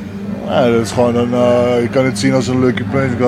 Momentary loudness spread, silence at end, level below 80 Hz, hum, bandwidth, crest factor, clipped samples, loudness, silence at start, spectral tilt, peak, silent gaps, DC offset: 4 LU; 0 s; -44 dBFS; none; 13.5 kHz; 14 dB; under 0.1%; -14 LUFS; 0 s; -6 dB/octave; 0 dBFS; none; under 0.1%